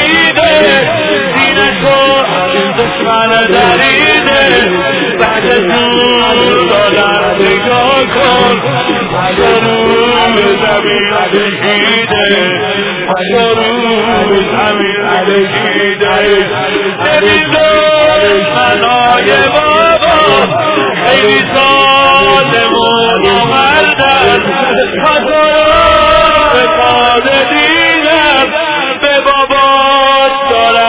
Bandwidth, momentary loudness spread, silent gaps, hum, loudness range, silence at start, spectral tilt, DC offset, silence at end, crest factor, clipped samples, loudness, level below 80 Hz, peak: 4 kHz; 4 LU; none; none; 3 LU; 0 s; -8 dB/octave; under 0.1%; 0 s; 8 dB; 0.9%; -7 LUFS; -34 dBFS; 0 dBFS